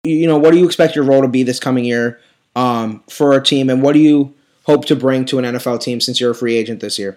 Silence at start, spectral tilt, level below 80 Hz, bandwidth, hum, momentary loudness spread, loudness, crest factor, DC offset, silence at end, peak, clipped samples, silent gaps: 0.05 s; -5.5 dB/octave; -66 dBFS; 15 kHz; none; 10 LU; -14 LUFS; 14 dB; under 0.1%; 0.05 s; 0 dBFS; under 0.1%; none